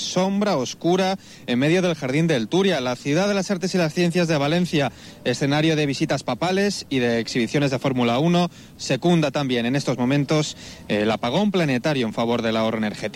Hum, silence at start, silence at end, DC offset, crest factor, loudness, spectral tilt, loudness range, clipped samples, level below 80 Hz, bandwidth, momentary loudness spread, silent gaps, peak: none; 0 s; 0 s; under 0.1%; 12 dB; -22 LUFS; -5.5 dB/octave; 1 LU; under 0.1%; -56 dBFS; 15.5 kHz; 4 LU; none; -8 dBFS